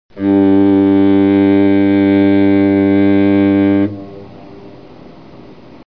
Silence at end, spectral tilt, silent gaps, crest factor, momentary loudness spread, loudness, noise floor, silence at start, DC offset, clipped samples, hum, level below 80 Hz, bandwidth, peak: 1.2 s; -10.5 dB/octave; none; 10 dB; 5 LU; -11 LUFS; -37 dBFS; 0.15 s; 0.7%; under 0.1%; none; -54 dBFS; 4.6 kHz; -2 dBFS